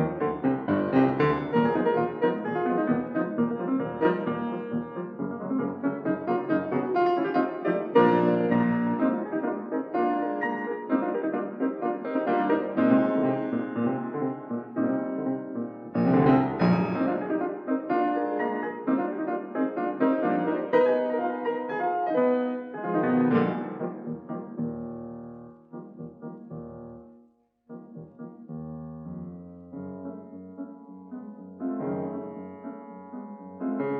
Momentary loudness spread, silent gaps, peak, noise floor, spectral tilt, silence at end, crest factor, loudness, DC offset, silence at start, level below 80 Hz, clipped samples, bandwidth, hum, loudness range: 19 LU; none; -8 dBFS; -62 dBFS; -10 dB/octave; 0 s; 20 dB; -27 LUFS; under 0.1%; 0 s; -64 dBFS; under 0.1%; 5.4 kHz; none; 16 LU